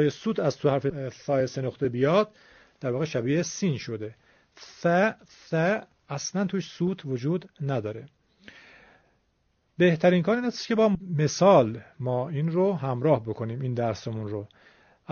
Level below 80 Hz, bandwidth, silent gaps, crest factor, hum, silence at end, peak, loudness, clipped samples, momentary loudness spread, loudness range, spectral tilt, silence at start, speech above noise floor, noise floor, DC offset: -64 dBFS; 6.8 kHz; none; 20 dB; none; 0 s; -6 dBFS; -26 LUFS; under 0.1%; 12 LU; 7 LU; -6 dB/octave; 0 s; 45 dB; -70 dBFS; under 0.1%